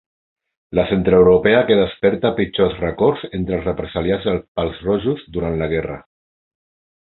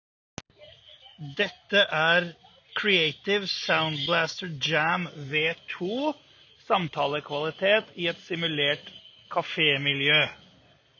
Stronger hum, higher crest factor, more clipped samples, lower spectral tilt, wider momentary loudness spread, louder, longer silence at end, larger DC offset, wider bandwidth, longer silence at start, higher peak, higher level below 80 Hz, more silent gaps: neither; about the same, 18 dB vs 20 dB; neither; first, -11.5 dB/octave vs -4.5 dB/octave; about the same, 11 LU vs 13 LU; first, -18 LUFS vs -25 LUFS; first, 1 s vs 0.65 s; neither; second, 4.2 kHz vs 7.2 kHz; first, 0.7 s vs 0.4 s; first, 0 dBFS vs -8 dBFS; first, -38 dBFS vs -68 dBFS; first, 4.48-4.55 s vs none